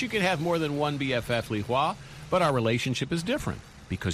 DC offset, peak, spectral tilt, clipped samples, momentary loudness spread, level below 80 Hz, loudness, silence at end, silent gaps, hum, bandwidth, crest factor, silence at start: under 0.1%; -10 dBFS; -5.5 dB/octave; under 0.1%; 9 LU; -50 dBFS; -28 LUFS; 0 s; none; none; 15 kHz; 18 dB; 0 s